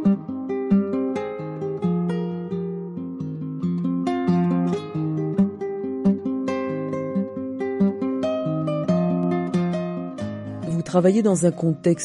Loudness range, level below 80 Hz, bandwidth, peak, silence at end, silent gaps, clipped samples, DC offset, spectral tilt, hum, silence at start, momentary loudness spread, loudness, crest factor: 3 LU; -62 dBFS; 11.5 kHz; -6 dBFS; 0 s; none; under 0.1%; under 0.1%; -7.5 dB/octave; none; 0 s; 10 LU; -24 LUFS; 16 dB